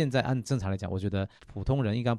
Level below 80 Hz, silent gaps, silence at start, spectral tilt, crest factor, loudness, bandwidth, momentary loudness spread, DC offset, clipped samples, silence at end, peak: -48 dBFS; none; 0 s; -7 dB/octave; 18 dB; -31 LUFS; 11 kHz; 8 LU; under 0.1%; under 0.1%; 0 s; -12 dBFS